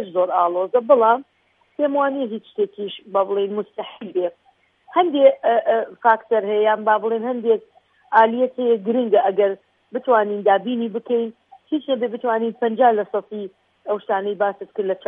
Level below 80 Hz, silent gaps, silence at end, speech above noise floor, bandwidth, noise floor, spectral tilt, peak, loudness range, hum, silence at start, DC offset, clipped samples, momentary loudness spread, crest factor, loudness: -78 dBFS; none; 0.1 s; 33 dB; 3.9 kHz; -52 dBFS; -8 dB/octave; -2 dBFS; 4 LU; none; 0 s; under 0.1%; under 0.1%; 12 LU; 18 dB; -20 LUFS